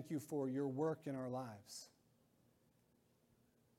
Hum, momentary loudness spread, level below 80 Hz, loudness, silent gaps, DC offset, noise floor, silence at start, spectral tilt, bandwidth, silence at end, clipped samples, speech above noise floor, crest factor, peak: none; 14 LU; -88 dBFS; -44 LUFS; none; under 0.1%; -77 dBFS; 0 s; -6.5 dB/octave; 16.5 kHz; 1.9 s; under 0.1%; 33 dB; 18 dB; -28 dBFS